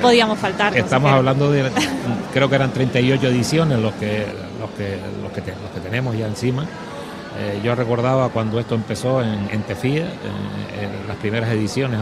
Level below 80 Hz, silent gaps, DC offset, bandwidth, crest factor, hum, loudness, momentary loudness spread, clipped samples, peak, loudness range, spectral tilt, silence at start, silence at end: -48 dBFS; none; under 0.1%; 13 kHz; 20 dB; none; -20 LUFS; 12 LU; under 0.1%; 0 dBFS; 7 LU; -6 dB/octave; 0 s; 0 s